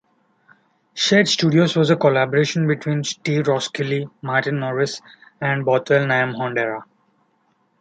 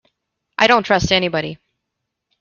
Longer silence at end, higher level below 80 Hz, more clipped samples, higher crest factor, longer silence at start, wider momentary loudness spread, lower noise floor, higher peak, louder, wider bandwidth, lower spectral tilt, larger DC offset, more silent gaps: first, 1 s vs 0.85 s; second, -64 dBFS vs -44 dBFS; neither; about the same, 18 dB vs 18 dB; first, 0.95 s vs 0.6 s; second, 9 LU vs 15 LU; second, -64 dBFS vs -78 dBFS; about the same, -2 dBFS vs 0 dBFS; second, -19 LUFS vs -16 LUFS; first, 9.2 kHz vs 7.4 kHz; about the same, -5 dB/octave vs -4 dB/octave; neither; neither